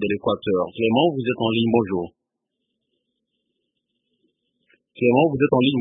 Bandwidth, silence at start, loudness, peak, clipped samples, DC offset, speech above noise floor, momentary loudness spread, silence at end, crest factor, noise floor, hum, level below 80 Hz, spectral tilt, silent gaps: 3.9 kHz; 0 s; -20 LUFS; -4 dBFS; under 0.1%; under 0.1%; 60 dB; 6 LU; 0 s; 18 dB; -80 dBFS; none; -58 dBFS; -11 dB/octave; none